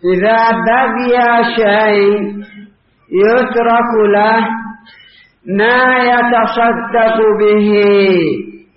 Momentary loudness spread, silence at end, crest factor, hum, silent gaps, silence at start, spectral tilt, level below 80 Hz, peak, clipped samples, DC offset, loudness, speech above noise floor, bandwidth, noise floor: 9 LU; 0.2 s; 10 dB; none; none; 0.05 s; -3.5 dB/octave; -50 dBFS; 0 dBFS; under 0.1%; under 0.1%; -11 LUFS; 33 dB; 5.8 kHz; -44 dBFS